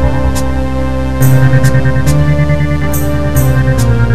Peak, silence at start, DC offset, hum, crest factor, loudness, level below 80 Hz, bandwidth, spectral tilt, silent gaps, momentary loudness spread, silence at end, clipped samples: 0 dBFS; 0 s; 20%; none; 12 dB; -11 LUFS; -18 dBFS; 14.5 kHz; -7 dB/octave; none; 7 LU; 0 s; 0.3%